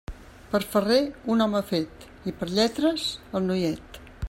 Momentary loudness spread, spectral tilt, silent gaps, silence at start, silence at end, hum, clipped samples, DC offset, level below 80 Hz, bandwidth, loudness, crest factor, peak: 14 LU; -5.5 dB/octave; none; 0.1 s; 0 s; none; under 0.1%; under 0.1%; -48 dBFS; 16 kHz; -26 LUFS; 16 dB; -10 dBFS